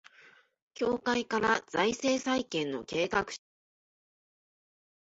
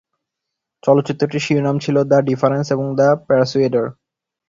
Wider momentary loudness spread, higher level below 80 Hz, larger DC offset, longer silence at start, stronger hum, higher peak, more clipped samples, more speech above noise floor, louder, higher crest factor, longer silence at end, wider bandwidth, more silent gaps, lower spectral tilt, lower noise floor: about the same, 6 LU vs 6 LU; second, -66 dBFS vs -58 dBFS; neither; about the same, 0.8 s vs 0.85 s; neither; second, -12 dBFS vs 0 dBFS; neither; second, 30 dB vs 65 dB; second, -31 LUFS vs -17 LUFS; first, 22 dB vs 16 dB; first, 1.75 s vs 0.55 s; about the same, 8 kHz vs 7.6 kHz; neither; second, -3.5 dB/octave vs -7 dB/octave; second, -60 dBFS vs -81 dBFS